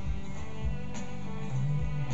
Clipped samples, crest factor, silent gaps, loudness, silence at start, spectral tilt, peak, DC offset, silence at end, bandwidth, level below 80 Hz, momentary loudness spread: under 0.1%; 12 dB; none; -36 LUFS; 0 s; -7 dB/octave; -20 dBFS; 3%; 0 s; 8 kHz; -40 dBFS; 8 LU